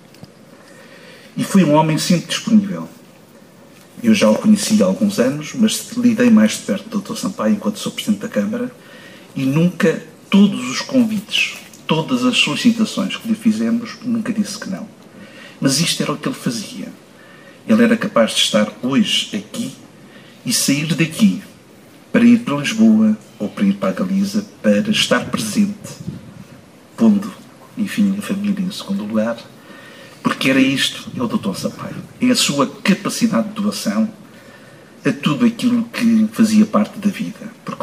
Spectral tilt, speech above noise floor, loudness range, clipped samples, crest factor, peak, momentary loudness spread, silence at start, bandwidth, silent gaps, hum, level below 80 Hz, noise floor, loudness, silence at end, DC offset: -4.5 dB/octave; 28 dB; 4 LU; under 0.1%; 14 dB; -2 dBFS; 14 LU; 0.8 s; 15.5 kHz; none; none; -62 dBFS; -44 dBFS; -17 LUFS; 0 s; under 0.1%